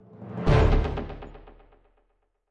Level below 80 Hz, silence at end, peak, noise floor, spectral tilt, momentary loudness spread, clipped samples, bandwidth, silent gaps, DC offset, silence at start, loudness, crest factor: -30 dBFS; 1.1 s; -6 dBFS; -71 dBFS; -8 dB/octave; 21 LU; under 0.1%; 7.4 kHz; none; under 0.1%; 0.2 s; -25 LUFS; 20 dB